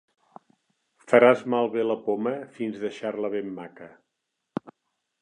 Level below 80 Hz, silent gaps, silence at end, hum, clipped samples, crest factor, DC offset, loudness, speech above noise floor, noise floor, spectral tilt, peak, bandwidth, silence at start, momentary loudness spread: -76 dBFS; none; 0.5 s; none; under 0.1%; 22 dB; under 0.1%; -24 LUFS; 57 dB; -81 dBFS; -6.5 dB/octave; -4 dBFS; 9.8 kHz; 1.1 s; 19 LU